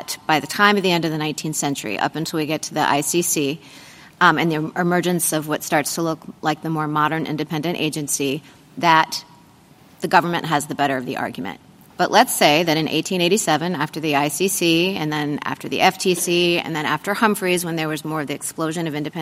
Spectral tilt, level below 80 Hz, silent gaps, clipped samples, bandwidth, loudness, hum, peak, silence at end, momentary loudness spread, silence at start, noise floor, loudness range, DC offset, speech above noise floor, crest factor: -3.5 dB/octave; -64 dBFS; none; under 0.1%; 16 kHz; -20 LUFS; none; 0 dBFS; 0 s; 9 LU; 0 s; -49 dBFS; 3 LU; under 0.1%; 29 dB; 20 dB